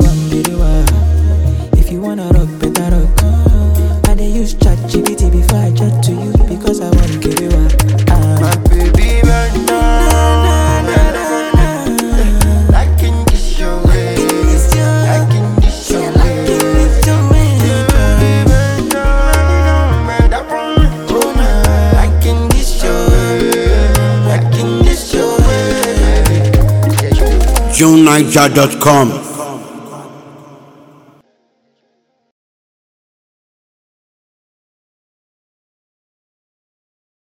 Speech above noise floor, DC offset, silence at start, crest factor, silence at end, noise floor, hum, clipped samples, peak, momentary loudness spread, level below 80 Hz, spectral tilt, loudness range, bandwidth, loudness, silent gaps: 52 dB; under 0.1%; 0 s; 10 dB; 7 s; -62 dBFS; none; 0.2%; 0 dBFS; 5 LU; -14 dBFS; -5.5 dB/octave; 3 LU; 18 kHz; -11 LUFS; none